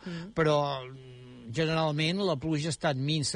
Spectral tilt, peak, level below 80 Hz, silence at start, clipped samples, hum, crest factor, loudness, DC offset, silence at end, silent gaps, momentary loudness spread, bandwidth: -5 dB/octave; -16 dBFS; -60 dBFS; 0 s; under 0.1%; none; 14 dB; -29 LUFS; under 0.1%; 0 s; none; 19 LU; 10.5 kHz